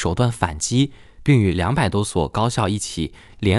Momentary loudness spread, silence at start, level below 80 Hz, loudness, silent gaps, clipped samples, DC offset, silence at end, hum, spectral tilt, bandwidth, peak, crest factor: 9 LU; 0 s; -38 dBFS; -21 LUFS; none; under 0.1%; under 0.1%; 0 s; none; -5.5 dB/octave; 12 kHz; -2 dBFS; 18 dB